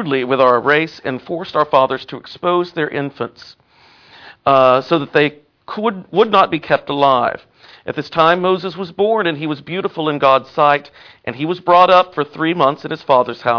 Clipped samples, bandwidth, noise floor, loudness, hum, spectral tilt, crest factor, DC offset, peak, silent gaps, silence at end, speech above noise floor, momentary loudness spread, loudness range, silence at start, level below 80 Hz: under 0.1%; 5.4 kHz; -49 dBFS; -15 LUFS; none; -7 dB/octave; 16 dB; under 0.1%; 0 dBFS; none; 0 s; 33 dB; 13 LU; 3 LU; 0 s; -58 dBFS